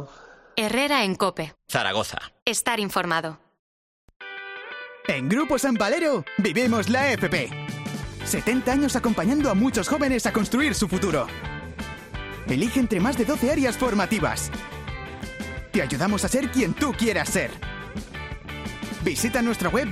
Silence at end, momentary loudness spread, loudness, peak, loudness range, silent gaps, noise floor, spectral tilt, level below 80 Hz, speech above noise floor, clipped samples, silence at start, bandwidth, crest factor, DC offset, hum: 0 s; 14 LU; -24 LUFS; -4 dBFS; 4 LU; 2.42-2.46 s, 3.59-4.08 s, 4.16-4.20 s; -49 dBFS; -4.5 dB/octave; -44 dBFS; 25 dB; under 0.1%; 0 s; 15.5 kHz; 20 dB; under 0.1%; none